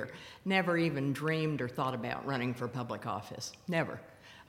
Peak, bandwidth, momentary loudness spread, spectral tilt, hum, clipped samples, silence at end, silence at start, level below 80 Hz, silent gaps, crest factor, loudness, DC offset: -14 dBFS; 16.5 kHz; 11 LU; -6 dB/octave; none; under 0.1%; 0.05 s; 0 s; -70 dBFS; none; 20 dB; -34 LUFS; under 0.1%